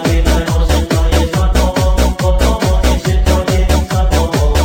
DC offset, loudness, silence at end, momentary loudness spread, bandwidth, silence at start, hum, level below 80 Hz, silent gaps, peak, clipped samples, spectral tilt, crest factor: under 0.1%; -13 LUFS; 0 s; 1 LU; 17 kHz; 0 s; none; -14 dBFS; none; 0 dBFS; under 0.1%; -5.5 dB/octave; 10 dB